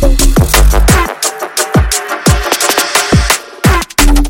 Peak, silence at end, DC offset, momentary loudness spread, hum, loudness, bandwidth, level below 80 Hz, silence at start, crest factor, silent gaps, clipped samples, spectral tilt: 0 dBFS; 0 s; under 0.1%; 5 LU; none; -10 LUFS; 17.5 kHz; -12 dBFS; 0 s; 10 dB; none; 0.2%; -3.5 dB/octave